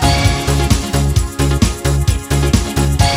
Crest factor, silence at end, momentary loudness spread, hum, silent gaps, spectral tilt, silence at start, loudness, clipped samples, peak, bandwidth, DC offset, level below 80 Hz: 14 dB; 0 s; 3 LU; none; none; -5 dB/octave; 0 s; -15 LUFS; under 0.1%; 0 dBFS; 16.5 kHz; under 0.1%; -18 dBFS